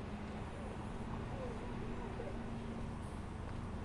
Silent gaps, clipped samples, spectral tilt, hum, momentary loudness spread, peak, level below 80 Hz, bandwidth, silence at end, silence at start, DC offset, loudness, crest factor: none; under 0.1%; -7 dB/octave; none; 2 LU; -30 dBFS; -50 dBFS; 11.5 kHz; 0 s; 0 s; under 0.1%; -45 LUFS; 12 dB